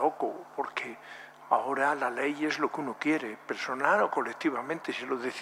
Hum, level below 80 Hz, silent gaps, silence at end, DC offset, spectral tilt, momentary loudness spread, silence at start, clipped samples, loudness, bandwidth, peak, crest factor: none; -86 dBFS; none; 0 s; under 0.1%; -4.5 dB/octave; 10 LU; 0 s; under 0.1%; -30 LUFS; 15 kHz; -8 dBFS; 22 dB